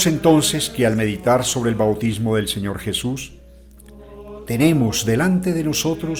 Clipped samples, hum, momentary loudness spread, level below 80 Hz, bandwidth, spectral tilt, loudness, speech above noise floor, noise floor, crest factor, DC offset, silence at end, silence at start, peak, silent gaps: under 0.1%; none; 11 LU; -44 dBFS; 19.5 kHz; -4.5 dB/octave; -19 LUFS; 25 dB; -44 dBFS; 16 dB; under 0.1%; 0 s; 0 s; -2 dBFS; none